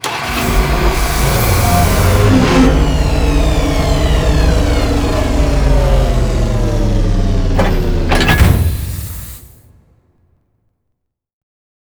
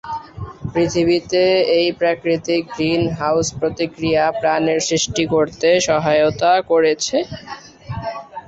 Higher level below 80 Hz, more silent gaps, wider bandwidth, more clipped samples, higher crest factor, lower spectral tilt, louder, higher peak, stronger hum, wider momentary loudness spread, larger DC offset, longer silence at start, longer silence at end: first, -16 dBFS vs -46 dBFS; neither; first, over 20 kHz vs 8 kHz; neither; about the same, 12 dB vs 14 dB; first, -5.5 dB/octave vs -4 dB/octave; first, -13 LUFS vs -17 LUFS; first, 0 dBFS vs -4 dBFS; neither; second, 6 LU vs 14 LU; neither; about the same, 0.05 s vs 0.05 s; first, 2.55 s vs 0.1 s